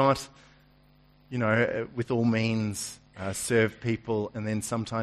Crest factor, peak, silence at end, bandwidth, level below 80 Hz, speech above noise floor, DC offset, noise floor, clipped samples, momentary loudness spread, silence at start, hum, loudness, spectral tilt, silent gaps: 18 dB; -10 dBFS; 0 s; 13.5 kHz; -58 dBFS; 32 dB; under 0.1%; -59 dBFS; under 0.1%; 11 LU; 0 s; 50 Hz at -60 dBFS; -29 LUFS; -5.5 dB/octave; none